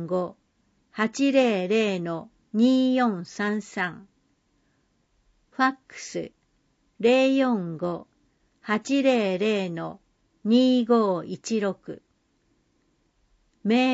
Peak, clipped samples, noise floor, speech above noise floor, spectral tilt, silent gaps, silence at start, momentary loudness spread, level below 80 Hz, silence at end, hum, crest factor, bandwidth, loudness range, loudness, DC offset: -8 dBFS; under 0.1%; -69 dBFS; 45 dB; -5.5 dB/octave; none; 0 s; 16 LU; -70 dBFS; 0 s; none; 16 dB; 8 kHz; 6 LU; -24 LUFS; under 0.1%